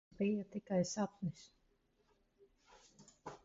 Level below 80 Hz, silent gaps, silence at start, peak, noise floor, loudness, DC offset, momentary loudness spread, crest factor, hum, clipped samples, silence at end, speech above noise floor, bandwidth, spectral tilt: -76 dBFS; none; 0.2 s; -26 dBFS; -77 dBFS; -40 LUFS; under 0.1%; 18 LU; 18 dB; none; under 0.1%; 0.1 s; 38 dB; 7.6 kHz; -7 dB/octave